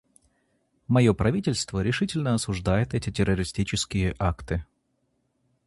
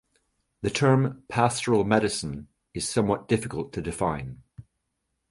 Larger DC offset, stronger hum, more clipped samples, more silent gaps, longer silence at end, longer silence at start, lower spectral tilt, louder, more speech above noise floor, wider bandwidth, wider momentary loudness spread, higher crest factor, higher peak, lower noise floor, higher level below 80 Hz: neither; neither; neither; neither; first, 1.05 s vs 0.7 s; first, 0.9 s vs 0.6 s; about the same, -5.5 dB/octave vs -5.5 dB/octave; about the same, -26 LUFS vs -26 LUFS; second, 48 dB vs 54 dB; about the same, 11.5 kHz vs 11.5 kHz; second, 7 LU vs 14 LU; about the same, 20 dB vs 22 dB; about the same, -6 dBFS vs -6 dBFS; second, -73 dBFS vs -79 dBFS; first, -40 dBFS vs -50 dBFS